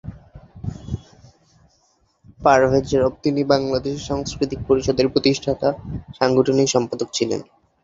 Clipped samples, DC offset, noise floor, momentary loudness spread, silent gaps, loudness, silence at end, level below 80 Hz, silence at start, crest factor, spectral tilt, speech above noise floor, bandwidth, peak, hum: under 0.1%; under 0.1%; -63 dBFS; 16 LU; none; -20 LUFS; 0.4 s; -42 dBFS; 0.05 s; 20 dB; -5 dB/octave; 43 dB; 8 kHz; 0 dBFS; none